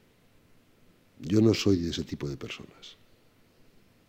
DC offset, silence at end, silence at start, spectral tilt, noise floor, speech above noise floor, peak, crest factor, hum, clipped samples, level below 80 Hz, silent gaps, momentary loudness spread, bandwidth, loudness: under 0.1%; 1.15 s; 1.2 s; -6 dB/octave; -62 dBFS; 34 dB; -10 dBFS; 20 dB; none; under 0.1%; -58 dBFS; none; 25 LU; 16 kHz; -28 LUFS